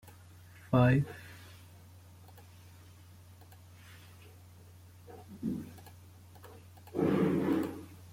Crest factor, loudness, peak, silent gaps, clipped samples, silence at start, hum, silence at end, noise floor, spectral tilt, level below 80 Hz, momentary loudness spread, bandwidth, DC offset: 22 dB; -31 LUFS; -14 dBFS; none; under 0.1%; 0.05 s; none; 0 s; -55 dBFS; -8 dB/octave; -62 dBFS; 27 LU; 16.5 kHz; under 0.1%